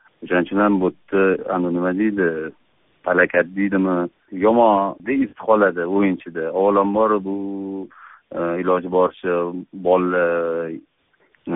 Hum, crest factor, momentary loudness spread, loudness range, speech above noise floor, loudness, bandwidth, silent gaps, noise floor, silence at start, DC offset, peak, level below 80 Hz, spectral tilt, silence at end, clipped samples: none; 18 dB; 12 LU; 3 LU; 42 dB; -20 LUFS; 3.9 kHz; none; -61 dBFS; 0.2 s; under 0.1%; -2 dBFS; -60 dBFS; -2 dB/octave; 0 s; under 0.1%